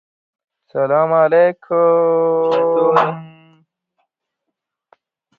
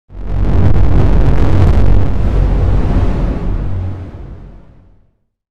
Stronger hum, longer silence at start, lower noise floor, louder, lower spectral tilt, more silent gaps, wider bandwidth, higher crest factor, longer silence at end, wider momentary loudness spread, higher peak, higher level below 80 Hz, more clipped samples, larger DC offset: neither; first, 0.75 s vs 0.1 s; first, -79 dBFS vs -53 dBFS; about the same, -15 LUFS vs -14 LUFS; about the same, -8 dB/octave vs -9 dB/octave; neither; second, 5 kHz vs 5.8 kHz; first, 16 dB vs 10 dB; first, 2.1 s vs 0 s; second, 8 LU vs 15 LU; about the same, 0 dBFS vs 0 dBFS; second, -66 dBFS vs -14 dBFS; neither; neither